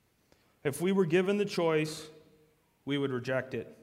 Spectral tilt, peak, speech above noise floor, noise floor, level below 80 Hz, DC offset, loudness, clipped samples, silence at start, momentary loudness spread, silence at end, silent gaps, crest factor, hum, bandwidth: -6 dB/octave; -14 dBFS; 38 dB; -68 dBFS; -72 dBFS; under 0.1%; -31 LUFS; under 0.1%; 0.65 s; 14 LU; 0.1 s; none; 18 dB; none; 16 kHz